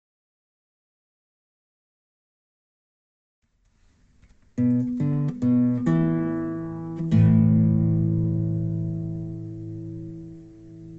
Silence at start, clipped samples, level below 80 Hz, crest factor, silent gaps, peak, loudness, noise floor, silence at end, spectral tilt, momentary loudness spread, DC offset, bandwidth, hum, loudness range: 4.55 s; under 0.1%; -48 dBFS; 16 dB; none; -8 dBFS; -23 LUFS; -62 dBFS; 0 s; -11 dB/octave; 18 LU; under 0.1%; 4 kHz; none; 8 LU